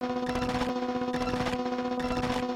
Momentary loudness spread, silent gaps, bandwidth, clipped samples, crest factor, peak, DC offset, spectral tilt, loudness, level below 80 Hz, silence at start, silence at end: 1 LU; none; 15 kHz; under 0.1%; 14 dB; -16 dBFS; under 0.1%; -5.5 dB/octave; -30 LUFS; -46 dBFS; 0 s; 0 s